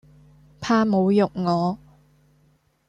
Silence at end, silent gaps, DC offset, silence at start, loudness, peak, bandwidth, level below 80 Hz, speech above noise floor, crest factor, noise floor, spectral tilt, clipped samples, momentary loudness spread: 1.15 s; none; under 0.1%; 0.6 s; -21 LUFS; -6 dBFS; 8 kHz; -58 dBFS; 42 dB; 18 dB; -62 dBFS; -7 dB/octave; under 0.1%; 13 LU